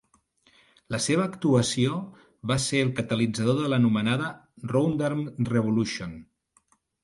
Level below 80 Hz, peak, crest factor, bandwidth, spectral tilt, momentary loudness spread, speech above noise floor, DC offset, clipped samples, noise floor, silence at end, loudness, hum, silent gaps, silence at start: -58 dBFS; -10 dBFS; 18 dB; 11.5 kHz; -5.5 dB/octave; 12 LU; 41 dB; under 0.1%; under 0.1%; -66 dBFS; 0.8 s; -26 LUFS; none; none; 0.9 s